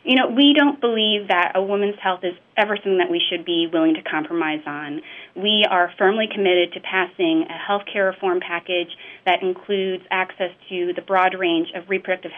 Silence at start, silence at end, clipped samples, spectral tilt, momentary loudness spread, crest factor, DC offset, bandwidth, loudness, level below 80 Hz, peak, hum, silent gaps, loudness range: 0.05 s; 0 s; under 0.1%; -6.5 dB/octave; 9 LU; 16 dB; under 0.1%; 4.2 kHz; -20 LUFS; -76 dBFS; -4 dBFS; none; none; 3 LU